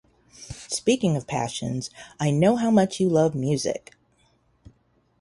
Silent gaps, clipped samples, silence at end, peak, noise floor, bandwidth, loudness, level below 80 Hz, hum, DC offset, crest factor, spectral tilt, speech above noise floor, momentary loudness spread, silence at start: none; under 0.1%; 1.45 s; -8 dBFS; -64 dBFS; 11.5 kHz; -24 LUFS; -56 dBFS; none; under 0.1%; 18 dB; -5.5 dB/octave; 42 dB; 13 LU; 0.4 s